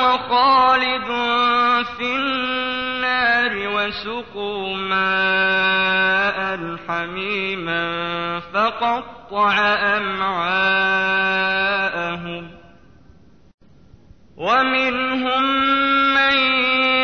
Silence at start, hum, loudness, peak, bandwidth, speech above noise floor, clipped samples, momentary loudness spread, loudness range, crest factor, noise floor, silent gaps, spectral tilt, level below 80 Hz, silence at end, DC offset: 0 s; none; -18 LUFS; -6 dBFS; 6.6 kHz; 30 dB; under 0.1%; 10 LU; 5 LU; 14 dB; -50 dBFS; 13.54-13.58 s; -4.5 dB/octave; -54 dBFS; 0 s; 0.3%